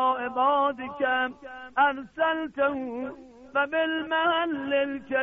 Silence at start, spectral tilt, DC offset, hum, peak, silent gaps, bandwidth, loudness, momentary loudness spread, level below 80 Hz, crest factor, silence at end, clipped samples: 0 s; -0.5 dB/octave; under 0.1%; none; -12 dBFS; none; 3.9 kHz; -26 LUFS; 9 LU; -64 dBFS; 14 dB; 0 s; under 0.1%